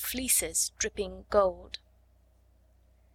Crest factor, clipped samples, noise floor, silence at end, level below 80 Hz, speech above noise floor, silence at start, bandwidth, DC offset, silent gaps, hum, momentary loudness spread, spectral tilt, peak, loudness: 22 dB; under 0.1%; -63 dBFS; 1.4 s; -52 dBFS; 33 dB; 0 s; 18 kHz; under 0.1%; none; none; 19 LU; -1.5 dB/octave; -12 dBFS; -28 LUFS